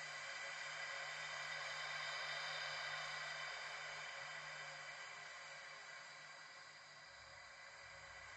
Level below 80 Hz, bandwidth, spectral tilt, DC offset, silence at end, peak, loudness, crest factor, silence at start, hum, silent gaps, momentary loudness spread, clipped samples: -82 dBFS; 11.5 kHz; 0 dB/octave; under 0.1%; 0 s; -34 dBFS; -48 LUFS; 16 dB; 0 s; none; none; 12 LU; under 0.1%